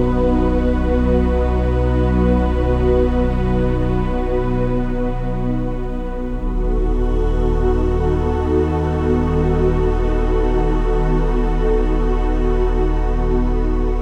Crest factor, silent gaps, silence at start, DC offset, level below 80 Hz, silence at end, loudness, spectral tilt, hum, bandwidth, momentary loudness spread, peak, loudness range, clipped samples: 12 dB; none; 0 s; under 0.1%; -18 dBFS; 0 s; -19 LUFS; -9 dB/octave; none; 6.4 kHz; 5 LU; -4 dBFS; 4 LU; under 0.1%